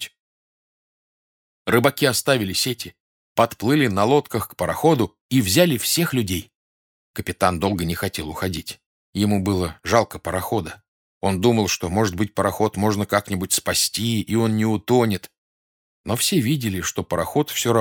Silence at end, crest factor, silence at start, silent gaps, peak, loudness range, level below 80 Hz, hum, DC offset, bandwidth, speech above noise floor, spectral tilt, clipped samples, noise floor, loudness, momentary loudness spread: 0 s; 20 dB; 0 s; 0.20-1.65 s, 3.00-3.35 s, 5.21-5.29 s, 6.55-7.14 s, 8.86-9.13 s, 10.88-11.21 s, 15.38-16.04 s; 0 dBFS; 4 LU; -50 dBFS; none; under 0.1%; 20 kHz; over 69 dB; -4.5 dB/octave; under 0.1%; under -90 dBFS; -21 LUFS; 10 LU